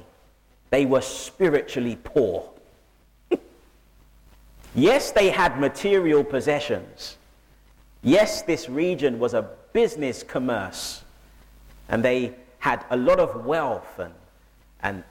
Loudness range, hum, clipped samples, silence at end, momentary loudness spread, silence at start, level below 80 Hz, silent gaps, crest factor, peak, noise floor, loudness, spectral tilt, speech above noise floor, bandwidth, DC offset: 5 LU; none; under 0.1%; 0.1 s; 13 LU; 0.7 s; -50 dBFS; none; 18 dB; -6 dBFS; -57 dBFS; -23 LUFS; -5 dB/octave; 35 dB; 16.5 kHz; under 0.1%